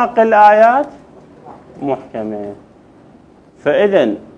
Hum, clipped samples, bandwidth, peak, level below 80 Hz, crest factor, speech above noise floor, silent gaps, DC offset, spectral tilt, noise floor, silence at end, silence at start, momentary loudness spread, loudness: none; under 0.1%; 9 kHz; 0 dBFS; -56 dBFS; 14 dB; 32 dB; none; under 0.1%; -6.5 dB/octave; -44 dBFS; 0.15 s; 0 s; 18 LU; -13 LUFS